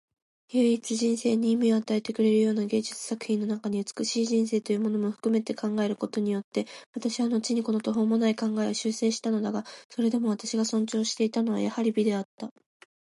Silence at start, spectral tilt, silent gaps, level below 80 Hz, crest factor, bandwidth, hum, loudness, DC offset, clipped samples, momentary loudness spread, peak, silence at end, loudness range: 0.5 s; -5 dB/octave; 6.44-6.52 s, 6.86-6.93 s, 9.85-9.90 s, 12.25-12.38 s; -78 dBFS; 14 dB; 11.5 kHz; none; -27 LUFS; under 0.1%; under 0.1%; 8 LU; -14 dBFS; 0.6 s; 2 LU